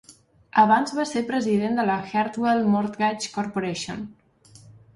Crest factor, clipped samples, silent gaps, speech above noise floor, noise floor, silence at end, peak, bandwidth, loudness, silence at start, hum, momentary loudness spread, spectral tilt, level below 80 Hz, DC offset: 20 dB; under 0.1%; none; 29 dB; -51 dBFS; 0.25 s; -4 dBFS; 11.5 kHz; -23 LUFS; 0.1 s; none; 11 LU; -5 dB/octave; -62 dBFS; under 0.1%